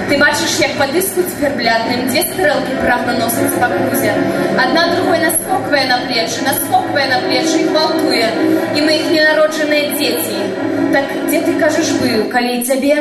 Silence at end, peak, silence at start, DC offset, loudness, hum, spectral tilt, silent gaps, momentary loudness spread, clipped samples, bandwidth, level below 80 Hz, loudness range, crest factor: 0 s; 0 dBFS; 0 s; under 0.1%; -14 LUFS; none; -3 dB/octave; none; 4 LU; under 0.1%; 15 kHz; -48 dBFS; 2 LU; 14 dB